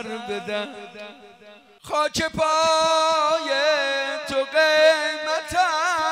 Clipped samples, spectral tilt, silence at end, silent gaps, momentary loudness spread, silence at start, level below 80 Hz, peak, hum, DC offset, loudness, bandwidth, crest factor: under 0.1%; -2 dB/octave; 0 s; none; 12 LU; 0 s; -56 dBFS; -6 dBFS; none; under 0.1%; -21 LUFS; 15.5 kHz; 16 dB